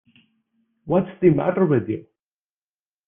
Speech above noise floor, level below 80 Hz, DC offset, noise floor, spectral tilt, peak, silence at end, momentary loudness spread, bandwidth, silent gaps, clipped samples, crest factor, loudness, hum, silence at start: over 71 dB; -58 dBFS; under 0.1%; under -90 dBFS; -12 dB/octave; -4 dBFS; 1.05 s; 10 LU; 3.6 kHz; none; under 0.1%; 20 dB; -21 LUFS; none; 0.85 s